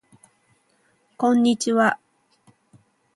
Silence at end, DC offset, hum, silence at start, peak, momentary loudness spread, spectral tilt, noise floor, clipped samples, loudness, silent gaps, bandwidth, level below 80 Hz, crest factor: 1.2 s; under 0.1%; none; 1.2 s; -6 dBFS; 6 LU; -4 dB/octave; -65 dBFS; under 0.1%; -20 LUFS; none; 11.5 kHz; -72 dBFS; 20 dB